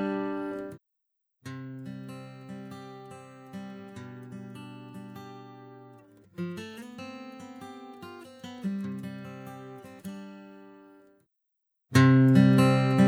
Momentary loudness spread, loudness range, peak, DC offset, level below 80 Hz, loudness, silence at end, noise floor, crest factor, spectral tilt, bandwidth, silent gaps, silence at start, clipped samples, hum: 26 LU; 18 LU; -8 dBFS; under 0.1%; -68 dBFS; -24 LUFS; 0 s; -81 dBFS; 22 dB; -7.5 dB/octave; 14 kHz; none; 0 s; under 0.1%; none